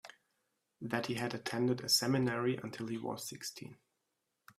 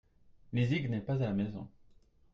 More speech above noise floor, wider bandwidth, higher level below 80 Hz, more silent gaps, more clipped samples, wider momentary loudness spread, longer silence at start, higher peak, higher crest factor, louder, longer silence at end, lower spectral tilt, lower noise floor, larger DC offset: first, 49 dB vs 30 dB; first, 16 kHz vs 7.2 kHz; second, -76 dBFS vs -62 dBFS; neither; neither; first, 15 LU vs 12 LU; second, 0.05 s vs 0.5 s; about the same, -18 dBFS vs -20 dBFS; about the same, 20 dB vs 16 dB; about the same, -35 LUFS vs -34 LUFS; first, 0.85 s vs 0.65 s; second, -4 dB/octave vs -8.5 dB/octave; first, -85 dBFS vs -63 dBFS; neither